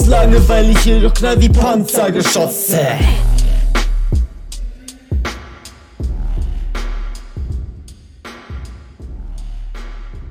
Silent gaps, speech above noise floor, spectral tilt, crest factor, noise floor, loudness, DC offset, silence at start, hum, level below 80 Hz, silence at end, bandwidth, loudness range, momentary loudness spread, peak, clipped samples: none; 27 dB; -5 dB/octave; 14 dB; -37 dBFS; -15 LUFS; under 0.1%; 0 s; none; -16 dBFS; 0 s; 19 kHz; 16 LU; 23 LU; 0 dBFS; under 0.1%